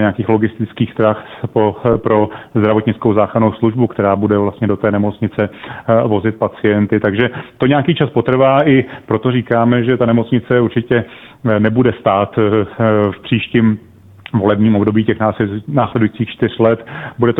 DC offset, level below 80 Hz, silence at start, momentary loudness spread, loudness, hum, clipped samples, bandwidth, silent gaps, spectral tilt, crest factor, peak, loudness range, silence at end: under 0.1%; -46 dBFS; 0 s; 6 LU; -14 LUFS; none; under 0.1%; 4 kHz; none; -10 dB/octave; 14 dB; 0 dBFS; 2 LU; 0 s